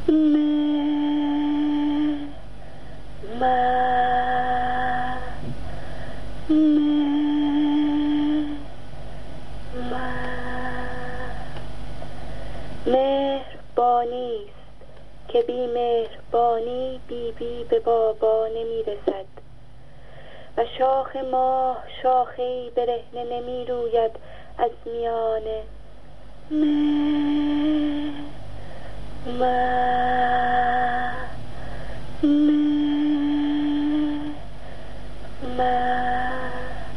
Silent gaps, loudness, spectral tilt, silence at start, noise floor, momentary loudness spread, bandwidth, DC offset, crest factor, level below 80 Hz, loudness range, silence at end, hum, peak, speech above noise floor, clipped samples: none; -23 LUFS; -7 dB/octave; 0 s; -47 dBFS; 18 LU; 10 kHz; 3%; 16 dB; -42 dBFS; 5 LU; 0 s; none; -6 dBFS; 24 dB; under 0.1%